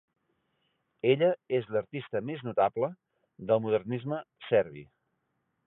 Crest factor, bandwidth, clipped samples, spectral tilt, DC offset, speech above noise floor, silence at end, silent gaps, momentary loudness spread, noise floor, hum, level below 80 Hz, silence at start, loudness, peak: 20 dB; 4 kHz; under 0.1%; -10.5 dB/octave; under 0.1%; 50 dB; 0.8 s; none; 11 LU; -79 dBFS; none; -72 dBFS; 1.05 s; -30 LUFS; -10 dBFS